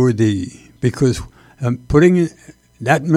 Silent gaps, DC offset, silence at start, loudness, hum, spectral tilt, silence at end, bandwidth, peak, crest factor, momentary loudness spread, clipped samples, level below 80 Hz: none; under 0.1%; 0 s; -17 LUFS; none; -7 dB/octave; 0 s; 13 kHz; 0 dBFS; 16 dB; 13 LU; under 0.1%; -38 dBFS